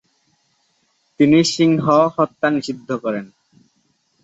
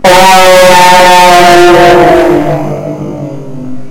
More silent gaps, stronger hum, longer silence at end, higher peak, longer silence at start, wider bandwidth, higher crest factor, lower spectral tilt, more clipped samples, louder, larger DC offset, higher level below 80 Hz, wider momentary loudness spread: neither; neither; first, 1 s vs 0 s; about the same, -2 dBFS vs 0 dBFS; first, 1.2 s vs 0 s; second, 8.2 kHz vs over 20 kHz; first, 18 dB vs 4 dB; first, -5.5 dB/octave vs -3.5 dB/octave; second, under 0.1% vs 20%; second, -17 LUFS vs -2 LUFS; second, under 0.1% vs 20%; second, -60 dBFS vs -30 dBFS; second, 11 LU vs 18 LU